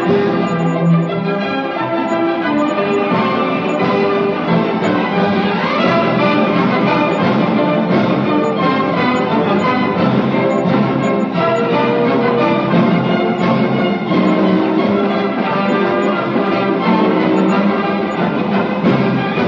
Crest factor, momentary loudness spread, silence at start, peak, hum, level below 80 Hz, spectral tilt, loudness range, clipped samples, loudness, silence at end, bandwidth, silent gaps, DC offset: 14 dB; 3 LU; 0 s; 0 dBFS; none; -56 dBFS; -7.5 dB/octave; 2 LU; under 0.1%; -15 LUFS; 0 s; 7.4 kHz; none; under 0.1%